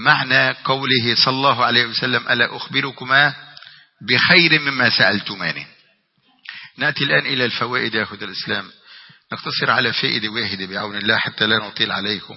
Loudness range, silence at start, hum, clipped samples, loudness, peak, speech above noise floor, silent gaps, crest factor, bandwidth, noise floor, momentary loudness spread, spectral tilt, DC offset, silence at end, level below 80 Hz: 5 LU; 0 s; none; under 0.1%; -17 LUFS; 0 dBFS; 42 dB; none; 20 dB; 6 kHz; -61 dBFS; 11 LU; -6.5 dB/octave; under 0.1%; 0 s; -62 dBFS